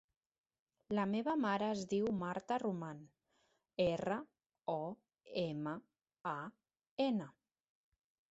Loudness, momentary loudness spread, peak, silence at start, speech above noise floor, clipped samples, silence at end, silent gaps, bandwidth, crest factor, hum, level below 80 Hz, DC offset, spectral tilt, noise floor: -40 LUFS; 14 LU; -24 dBFS; 0.9 s; 41 dB; under 0.1%; 1 s; 4.46-4.50 s, 6.91-6.97 s; 8 kHz; 18 dB; none; -74 dBFS; under 0.1%; -5 dB/octave; -79 dBFS